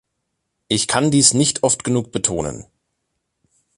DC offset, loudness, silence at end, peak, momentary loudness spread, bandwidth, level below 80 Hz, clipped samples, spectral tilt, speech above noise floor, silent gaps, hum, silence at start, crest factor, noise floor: under 0.1%; -17 LUFS; 1.15 s; 0 dBFS; 12 LU; 11.5 kHz; -48 dBFS; under 0.1%; -3.5 dB/octave; 57 dB; none; none; 0.7 s; 20 dB; -75 dBFS